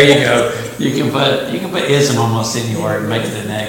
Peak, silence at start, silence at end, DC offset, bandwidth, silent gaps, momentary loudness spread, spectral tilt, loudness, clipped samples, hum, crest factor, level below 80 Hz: 0 dBFS; 0 s; 0 s; under 0.1%; 17 kHz; none; 7 LU; -4.5 dB/octave; -15 LUFS; under 0.1%; none; 14 dB; -48 dBFS